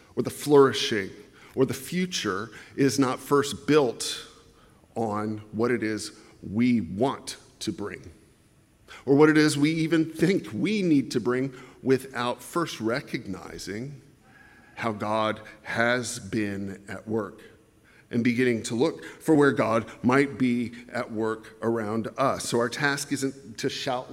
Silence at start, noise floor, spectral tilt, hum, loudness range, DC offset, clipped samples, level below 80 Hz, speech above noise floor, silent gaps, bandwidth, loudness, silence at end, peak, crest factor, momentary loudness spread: 0.15 s; -60 dBFS; -5 dB/octave; none; 6 LU; under 0.1%; under 0.1%; -64 dBFS; 34 dB; none; 16 kHz; -26 LUFS; 0 s; -6 dBFS; 20 dB; 15 LU